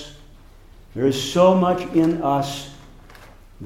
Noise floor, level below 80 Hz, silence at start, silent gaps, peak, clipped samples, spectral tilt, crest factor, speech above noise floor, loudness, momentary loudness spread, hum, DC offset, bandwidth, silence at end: -45 dBFS; -46 dBFS; 0 s; none; -4 dBFS; under 0.1%; -6 dB/octave; 18 dB; 27 dB; -19 LUFS; 21 LU; none; under 0.1%; 16 kHz; 0 s